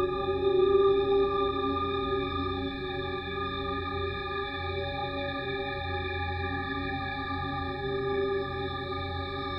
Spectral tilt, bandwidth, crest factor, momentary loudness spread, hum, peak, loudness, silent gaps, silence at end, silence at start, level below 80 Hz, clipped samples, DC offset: -8 dB/octave; 5.6 kHz; 16 dB; 9 LU; none; -14 dBFS; -30 LUFS; none; 0 s; 0 s; -46 dBFS; under 0.1%; under 0.1%